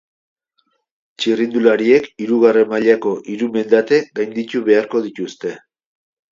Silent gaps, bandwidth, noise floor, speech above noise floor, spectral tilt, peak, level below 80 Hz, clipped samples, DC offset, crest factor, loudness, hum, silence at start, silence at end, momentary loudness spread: none; 7.6 kHz; -66 dBFS; 51 dB; -5.5 dB/octave; 0 dBFS; -66 dBFS; under 0.1%; under 0.1%; 16 dB; -16 LUFS; none; 1.2 s; 0.75 s; 11 LU